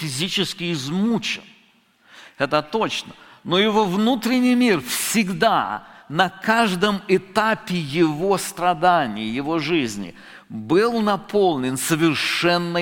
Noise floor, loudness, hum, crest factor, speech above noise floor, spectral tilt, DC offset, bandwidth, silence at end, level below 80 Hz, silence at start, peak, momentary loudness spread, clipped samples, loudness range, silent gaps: -57 dBFS; -20 LUFS; none; 18 dB; 37 dB; -4.5 dB/octave; under 0.1%; 17 kHz; 0 s; -56 dBFS; 0 s; -2 dBFS; 9 LU; under 0.1%; 3 LU; none